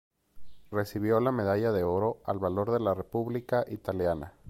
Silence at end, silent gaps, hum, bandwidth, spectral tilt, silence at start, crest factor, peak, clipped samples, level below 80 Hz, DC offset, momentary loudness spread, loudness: 0 s; none; none; 16.5 kHz; -8 dB/octave; 0.35 s; 16 dB; -14 dBFS; under 0.1%; -56 dBFS; under 0.1%; 6 LU; -30 LUFS